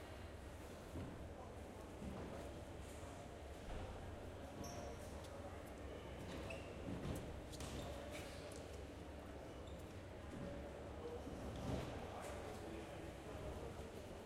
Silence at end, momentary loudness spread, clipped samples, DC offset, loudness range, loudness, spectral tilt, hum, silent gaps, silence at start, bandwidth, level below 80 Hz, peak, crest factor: 0 s; 5 LU; under 0.1%; under 0.1%; 3 LU; -52 LUFS; -5.5 dB/octave; none; none; 0 s; 16 kHz; -58 dBFS; -32 dBFS; 18 dB